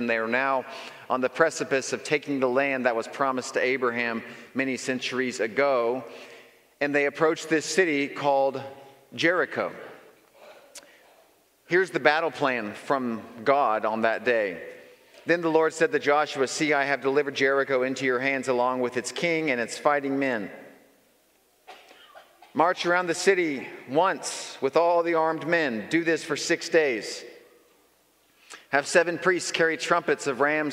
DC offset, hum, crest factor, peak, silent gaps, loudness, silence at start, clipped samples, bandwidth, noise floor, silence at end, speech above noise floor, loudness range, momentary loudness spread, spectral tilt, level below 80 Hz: under 0.1%; none; 24 dB; -2 dBFS; none; -25 LUFS; 0 s; under 0.1%; 15.5 kHz; -64 dBFS; 0 s; 39 dB; 4 LU; 9 LU; -3.5 dB/octave; -80 dBFS